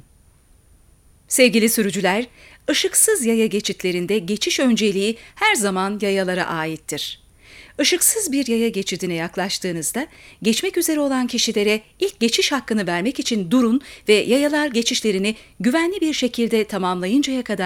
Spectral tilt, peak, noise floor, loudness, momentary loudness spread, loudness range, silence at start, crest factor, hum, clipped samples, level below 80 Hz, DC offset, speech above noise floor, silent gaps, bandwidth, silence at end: -3 dB/octave; -2 dBFS; -53 dBFS; -19 LUFS; 9 LU; 3 LU; 1.3 s; 18 dB; none; under 0.1%; -54 dBFS; under 0.1%; 33 dB; none; 19 kHz; 0 s